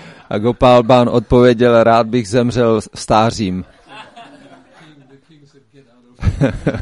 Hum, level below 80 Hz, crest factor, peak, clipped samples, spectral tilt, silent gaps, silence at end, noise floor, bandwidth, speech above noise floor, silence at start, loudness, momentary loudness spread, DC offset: none; -34 dBFS; 14 dB; 0 dBFS; under 0.1%; -6.5 dB/octave; none; 0 s; -49 dBFS; 11.5 kHz; 36 dB; 0 s; -13 LUFS; 12 LU; under 0.1%